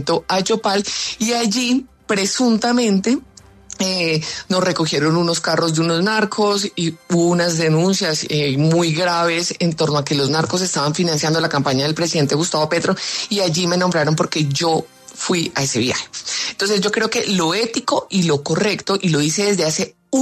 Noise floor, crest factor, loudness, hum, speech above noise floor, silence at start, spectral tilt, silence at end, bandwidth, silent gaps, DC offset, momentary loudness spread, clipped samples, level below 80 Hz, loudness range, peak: -39 dBFS; 14 dB; -18 LUFS; none; 21 dB; 0 s; -4 dB/octave; 0 s; 13.5 kHz; none; under 0.1%; 5 LU; under 0.1%; -56 dBFS; 2 LU; -4 dBFS